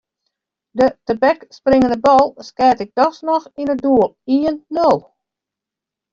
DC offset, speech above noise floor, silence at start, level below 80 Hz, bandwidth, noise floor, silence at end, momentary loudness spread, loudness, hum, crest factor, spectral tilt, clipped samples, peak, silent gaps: under 0.1%; 70 dB; 0.75 s; -50 dBFS; 7.6 kHz; -85 dBFS; 1.15 s; 7 LU; -16 LUFS; none; 14 dB; -6.5 dB/octave; under 0.1%; -2 dBFS; none